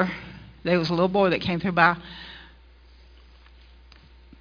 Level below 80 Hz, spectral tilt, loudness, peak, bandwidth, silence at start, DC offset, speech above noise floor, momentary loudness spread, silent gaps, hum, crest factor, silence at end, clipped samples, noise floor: -50 dBFS; -7 dB/octave; -23 LUFS; -2 dBFS; 5.2 kHz; 0 s; under 0.1%; 29 dB; 22 LU; none; none; 24 dB; 1.95 s; under 0.1%; -51 dBFS